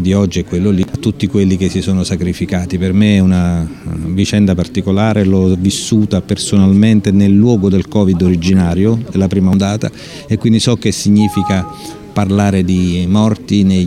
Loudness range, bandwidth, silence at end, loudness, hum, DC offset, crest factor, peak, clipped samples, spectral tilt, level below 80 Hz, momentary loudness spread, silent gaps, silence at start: 3 LU; 12.5 kHz; 0 s; -13 LUFS; none; under 0.1%; 12 dB; 0 dBFS; under 0.1%; -6.5 dB/octave; -36 dBFS; 7 LU; none; 0 s